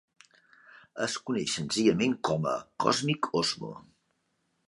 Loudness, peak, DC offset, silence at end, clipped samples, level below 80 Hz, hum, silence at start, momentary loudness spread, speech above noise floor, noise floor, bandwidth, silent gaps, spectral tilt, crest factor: -29 LUFS; -8 dBFS; under 0.1%; 0.85 s; under 0.1%; -66 dBFS; none; 0.95 s; 12 LU; 47 dB; -76 dBFS; 11.5 kHz; none; -4 dB/octave; 22 dB